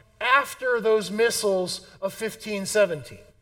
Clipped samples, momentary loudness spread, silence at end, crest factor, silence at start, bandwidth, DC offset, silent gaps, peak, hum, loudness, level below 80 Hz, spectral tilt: under 0.1%; 10 LU; 0.2 s; 20 dB; 0.2 s; 17.5 kHz; under 0.1%; none; -4 dBFS; none; -24 LUFS; -62 dBFS; -3 dB/octave